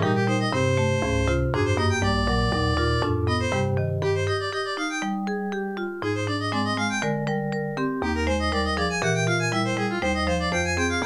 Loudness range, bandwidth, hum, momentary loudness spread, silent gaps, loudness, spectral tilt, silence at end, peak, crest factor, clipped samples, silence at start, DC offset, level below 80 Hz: 3 LU; 12 kHz; none; 5 LU; none; -24 LUFS; -5.5 dB/octave; 0 s; -8 dBFS; 16 dB; under 0.1%; 0 s; 0.2%; -36 dBFS